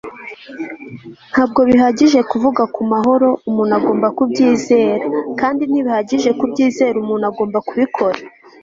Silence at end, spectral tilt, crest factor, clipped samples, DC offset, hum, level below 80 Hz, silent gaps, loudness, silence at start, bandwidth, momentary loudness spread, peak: 0.35 s; -5.5 dB/octave; 14 dB; under 0.1%; under 0.1%; none; -54 dBFS; none; -15 LUFS; 0.05 s; 7.6 kHz; 16 LU; -2 dBFS